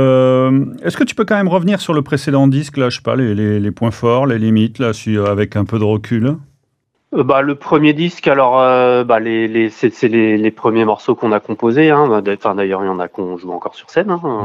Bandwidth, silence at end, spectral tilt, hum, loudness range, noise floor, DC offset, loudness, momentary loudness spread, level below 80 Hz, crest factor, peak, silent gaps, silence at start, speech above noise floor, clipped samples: 12.5 kHz; 0 s; -7 dB/octave; none; 3 LU; -66 dBFS; under 0.1%; -14 LUFS; 8 LU; -54 dBFS; 14 dB; 0 dBFS; none; 0 s; 52 dB; under 0.1%